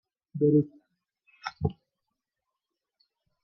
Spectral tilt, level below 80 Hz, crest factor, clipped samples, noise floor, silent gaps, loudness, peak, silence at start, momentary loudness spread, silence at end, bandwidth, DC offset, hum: -9.5 dB/octave; -58 dBFS; 20 dB; under 0.1%; -87 dBFS; none; -28 LUFS; -12 dBFS; 0.35 s; 17 LU; 1.7 s; 6.2 kHz; under 0.1%; none